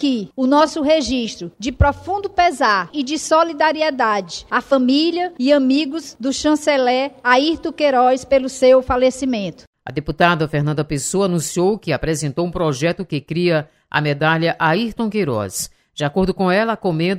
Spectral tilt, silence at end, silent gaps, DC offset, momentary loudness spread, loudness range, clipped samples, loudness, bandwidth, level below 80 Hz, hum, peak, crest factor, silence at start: -5 dB/octave; 0 s; 9.67-9.73 s; under 0.1%; 9 LU; 3 LU; under 0.1%; -18 LUFS; 15.5 kHz; -38 dBFS; none; 0 dBFS; 16 dB; 0 s